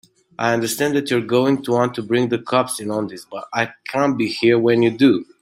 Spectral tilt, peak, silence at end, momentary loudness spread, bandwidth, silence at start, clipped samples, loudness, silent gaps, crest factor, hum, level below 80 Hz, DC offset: -5 dB/octave; -2 dBFS; 0.2 s; 8 LU; 16 kHz; 0.4 s; under 0.1%; -19 LUFS; none; 16 dB; none; -62 dBFS; under 0.1%